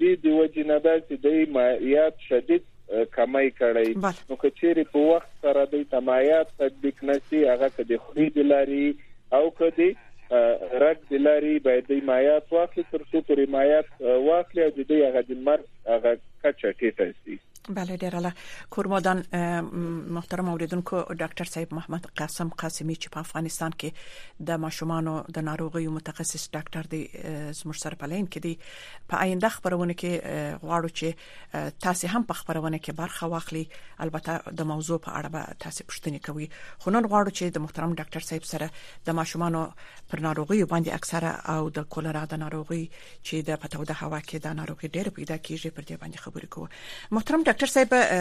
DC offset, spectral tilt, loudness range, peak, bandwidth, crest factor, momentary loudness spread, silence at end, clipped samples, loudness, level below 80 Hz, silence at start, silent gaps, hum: under 0.1%; -5.5 dB/octave; 10 LU; -8 dBFS; 15 kHz; 18 dB; 14 LU; 0 s; under 0.1%; -26 LUFS; -56 dBFS; 0 s; none; none